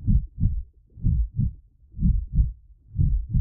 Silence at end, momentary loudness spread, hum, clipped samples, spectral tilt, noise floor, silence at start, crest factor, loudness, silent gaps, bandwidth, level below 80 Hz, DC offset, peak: 0 s; 12 LU; none; under 0.1%; -18.5 dB/octave; -44 dBFS; 0 s; 14 dB; -27 LUFS; none; 0.6 kHz; -26 dBFS; under 0.1%; -10 dBFS